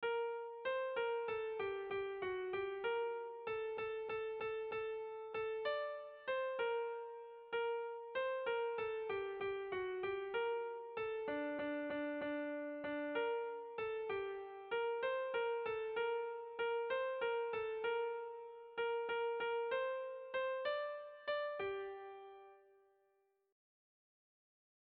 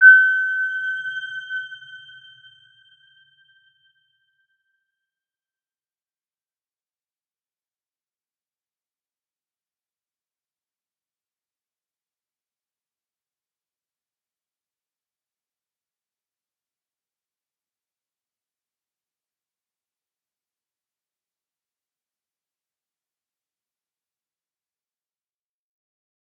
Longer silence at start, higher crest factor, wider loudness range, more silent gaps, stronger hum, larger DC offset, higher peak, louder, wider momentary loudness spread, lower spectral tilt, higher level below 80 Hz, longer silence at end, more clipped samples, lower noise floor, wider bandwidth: about the same, 0 s vs 0 s; second, 14 dB vs 28 dB; second, 3 LU vs 26 LU; neither; neither; neither; second, -28 dBFS vs -2 dBFS; second, -42 LUFS vs -18 LUFS; second, 6 LU vs 26 LU; first, -1.5 dB/octave vs 2 dB/octave; first, -78 dBFS vs under -90 dBFS; second, 2.25 s vs 24.25 s; neither; second, -79 dBFS vs under -90 dBFS; second, 4.8 kHz vs 6.6 kHz